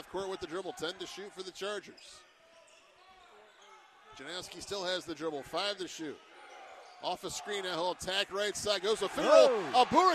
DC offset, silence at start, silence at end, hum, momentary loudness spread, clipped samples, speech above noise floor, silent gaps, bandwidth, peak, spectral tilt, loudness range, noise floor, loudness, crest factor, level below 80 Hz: under 0.1%; 0 s; 0 s; none; 26 LU; under 0.1%; 29 dB; none; 14 kHz; -10 dBFS; -2.5 dB/octave; 16 LU; -61 dBFS; -32 LUFS; 22 dB; -68 dBFS